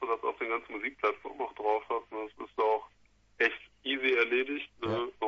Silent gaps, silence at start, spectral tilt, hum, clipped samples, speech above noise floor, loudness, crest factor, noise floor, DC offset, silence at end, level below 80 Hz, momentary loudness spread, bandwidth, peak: none; 0 s; -5.5 dB/octave; none; under 0.1%; 31 dB; -32 LUFS; 20 dB; -65 dBFS; under 0.1%; 0 s; -70 dBFS; 11 LU; 7 kHz; -12 dBFS